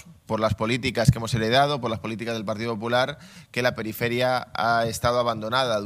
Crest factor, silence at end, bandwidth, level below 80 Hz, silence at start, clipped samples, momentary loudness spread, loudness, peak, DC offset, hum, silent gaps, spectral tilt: 22 dB; 0 s; 15.5 kHz; -46 dBFS; 0.05 s; under 0.1%; 8 LU; -24 LUFS; -2 dBFS; under 0.1%; none; none; -5 dB/octave